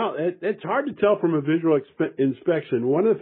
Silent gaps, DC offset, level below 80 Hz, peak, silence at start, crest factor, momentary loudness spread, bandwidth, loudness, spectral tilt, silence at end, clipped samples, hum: none; under 0.1%; -70 dBFS; -8 dBFS; 0 s; 14 dB; 5 LU; 4.1 kHz; -23 LUFS; -6.5 dB/octave; 0 s; under 0.1%; none